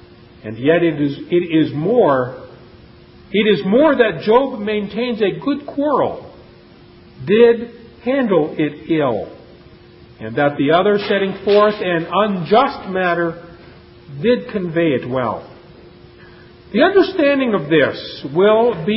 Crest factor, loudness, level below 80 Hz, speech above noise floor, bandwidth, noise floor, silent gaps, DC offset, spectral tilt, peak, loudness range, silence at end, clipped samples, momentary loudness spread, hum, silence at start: 16 dB; -16 LUFS; -52 dBFS; 28 dB; 5.8 kHz; -43 dBFS; none; under 0.1%; -11 dB/octave; 0 dBFS; 4 LU; 0 s; under 0.1%; 12 LU; none; 0.45 s